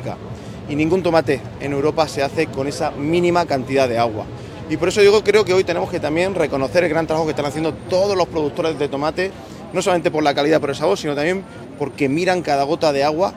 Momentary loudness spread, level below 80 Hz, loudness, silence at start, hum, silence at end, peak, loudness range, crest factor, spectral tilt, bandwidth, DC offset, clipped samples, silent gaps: 11 LU; -48 dBFS; -19 LUFS; 0 s; none; 0 s; -2 dBFS; 3 LU; 18 dB; -5.5 dB/octave; 15.5 kHz; under 0.1%; under 0.1%; none